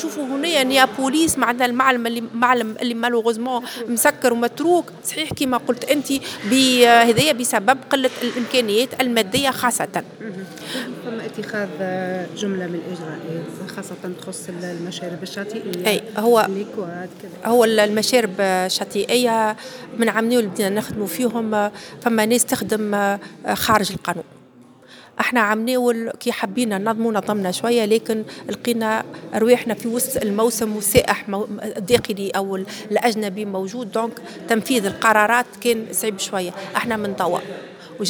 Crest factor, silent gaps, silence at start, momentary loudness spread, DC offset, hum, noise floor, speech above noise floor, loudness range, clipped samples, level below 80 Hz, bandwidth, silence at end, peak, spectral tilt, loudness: 20 dB; none; 0 s; 13 LU; under 0.1%; none; -47 dBFS; 27 dB; 9 LU; under 0.1%; -54 dBFS; over 20 kHz; 0 s; 0 dBFS; -3.5 dB/octave; -20 LUFS